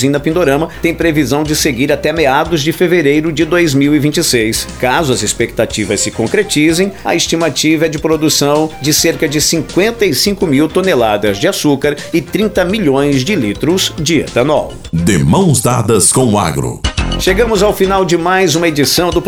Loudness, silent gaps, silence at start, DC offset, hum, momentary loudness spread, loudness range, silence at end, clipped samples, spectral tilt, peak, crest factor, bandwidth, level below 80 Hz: -12 LUFS; none; 0 s; under 0.1%; none; 4 LU; 2 LU; 0 s; under 0.1%; -4 dB/octave; 0 dBFS; 12 dB; 19.5 kHz; -30 dBFS